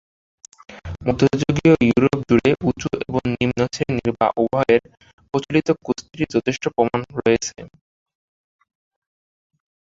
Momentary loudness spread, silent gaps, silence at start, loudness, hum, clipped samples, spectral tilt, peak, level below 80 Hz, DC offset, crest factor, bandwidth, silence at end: 10 LU; 5.13-5.18 s; 0.7 s; -20 LUFS; none; under 0.1%; -6 dB/octave; -2 dBFS; -46 dBFS; under 0.1%; 20 dB; 7.8 kHz; 2.25 s